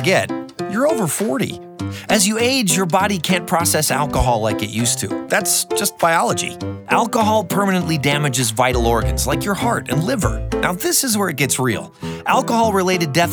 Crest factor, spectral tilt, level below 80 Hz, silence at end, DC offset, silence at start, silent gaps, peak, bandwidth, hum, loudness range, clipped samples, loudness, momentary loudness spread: 16 dB; -4 dB/octave; -34 dBFS; 0 s; under 0.1%; 0 s; none; -2 dBFS; over 20 kHz; none; 1 LU; under 0.1%; -17 LUFS; 6 LU